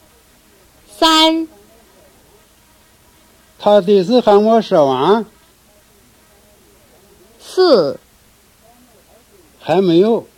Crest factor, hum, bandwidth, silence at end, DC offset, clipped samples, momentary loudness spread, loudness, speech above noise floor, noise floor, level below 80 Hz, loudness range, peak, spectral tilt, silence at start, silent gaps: 16 dB; none; 17 kHz; 0.15 s; under 0.1%; under 0.1%; 12 LU; -13 LUFS; 38 dB; -50 dBFS; -54 dBFS; 6 LU; 0 dBFS; -5 dB/octave; 1 s; none